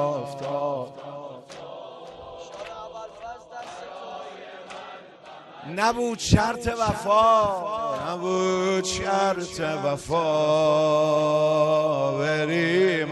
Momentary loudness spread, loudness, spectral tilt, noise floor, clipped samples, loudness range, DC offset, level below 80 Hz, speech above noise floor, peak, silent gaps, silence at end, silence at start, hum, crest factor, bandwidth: 20 LU; -23 LUFS; -5 dB/octave; -45 dBFS; under 0.1%; 17 LU; under 0.1%; -48 dBFS; 22 dB; -2 dBFS; none; 0 s; 0 s; none; 22 dB; 12 kHz